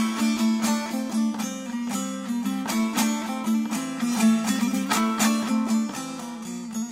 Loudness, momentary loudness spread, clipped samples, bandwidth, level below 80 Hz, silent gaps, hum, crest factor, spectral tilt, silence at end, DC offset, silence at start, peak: -25 LUFS; 10 LU; under 0.1%; 16 kHz; -66 dBFS; none; none; 16 dB; -4 dB/octave; 0 s; under 0.1%; 0 s; -8 dBFS